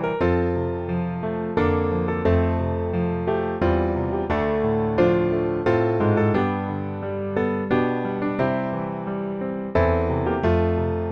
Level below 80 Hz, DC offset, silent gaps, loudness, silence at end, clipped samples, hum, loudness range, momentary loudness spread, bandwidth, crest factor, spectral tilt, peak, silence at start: -38 dBFS; under 0.1%; none; -23 LUFS; 0 s; under 0.1%; none; 3 LU; 7 LU; 6.2 kHz; 16 dB; -9.5 dB/octave; -6 dBFS; 0 s